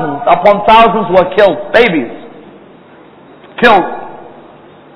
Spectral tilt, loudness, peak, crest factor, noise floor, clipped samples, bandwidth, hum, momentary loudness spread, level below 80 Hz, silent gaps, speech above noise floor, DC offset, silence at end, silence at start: -7 dB/octave; -9 LUFS; 0 dBFS; 12 dB; -38 dBFS; 2%; 5.4 kHz; none; 20 LU; -40 dBFS; none; 30 dB; under 0.1%; 0.65 s; 0 s